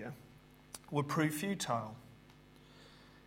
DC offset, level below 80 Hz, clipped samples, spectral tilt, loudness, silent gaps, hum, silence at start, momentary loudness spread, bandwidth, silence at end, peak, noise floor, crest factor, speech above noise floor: under 0.1%; -70 dBFS; under 0.1%; -5 dB/octave; -37 LUFS; none; none; 0 s; 25 LU; 16 kHz; 0.05 s; -20 dBFS; -60 dBFS; 22 dB; 24 dB